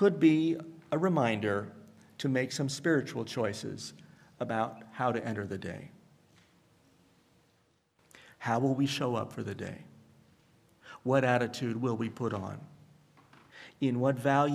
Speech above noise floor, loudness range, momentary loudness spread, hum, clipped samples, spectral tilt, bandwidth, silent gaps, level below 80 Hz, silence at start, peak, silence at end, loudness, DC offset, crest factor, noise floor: 40 dB; 7 LU; 16 LU; none; under 0.1%; -6 dB/octave; 14 kHz; none; -74 dBFS; 0 s; -12 dBFS; 0 s; -32 LUFS; under 0.1%; 20 dB; -71 dBFS